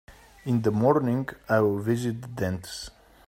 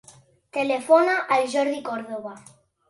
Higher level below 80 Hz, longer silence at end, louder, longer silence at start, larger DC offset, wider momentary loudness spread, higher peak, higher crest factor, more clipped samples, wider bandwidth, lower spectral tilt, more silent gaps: first, -56 dBFS vs -74 dBFS; about the same, 0.4 s vs 0.5 s; second, -26 LUFS vs -22 LUFS; second, 0.1 s vs 0.55 s; neither; about the same, 15 LU vs 16 LU; second, -8 dBFS vs -4 dBFS; about the same, 20 dB vs 20 dB; neither; first, 16 kHz vs 11.5 kHz; first, -7 dB/octave vs -3.5 dB/octave; neither